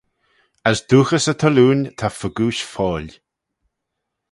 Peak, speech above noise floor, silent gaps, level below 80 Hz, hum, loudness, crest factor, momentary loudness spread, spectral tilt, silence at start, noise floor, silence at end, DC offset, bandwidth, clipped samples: 0 dBFS; 62 dB; none; -48 dBFS; none; -18 LUFS; 20 dB; 10 LU; -5.5 dB/octave; 0.65 s; -79 dBFS; 1.2 s; under 0.1%; 11.5 kHz; under 0.1%